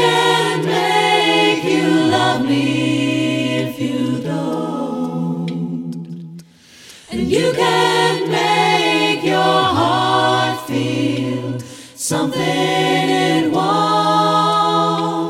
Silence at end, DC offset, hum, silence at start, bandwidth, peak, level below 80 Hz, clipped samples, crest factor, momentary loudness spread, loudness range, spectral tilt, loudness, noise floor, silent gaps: 0 s; under 0.1%; none; 0 s; 16.5 kHz; -2 dBFS; -54 dBFS; under 0.1%; 14 dB; 9 LU; 7 LU; -4.5 dB/octave; -16 LUFS; -43 dBFS; none